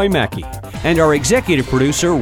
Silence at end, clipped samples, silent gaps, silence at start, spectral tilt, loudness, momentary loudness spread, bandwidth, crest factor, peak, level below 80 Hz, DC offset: 0 s; under 0.1%; none; 0 s; -4.5 dB/octave; -15 LUFS; 10 LU; 19 kHz; 14 dB; -2 dBFS; -32 dBFS; under 0.1%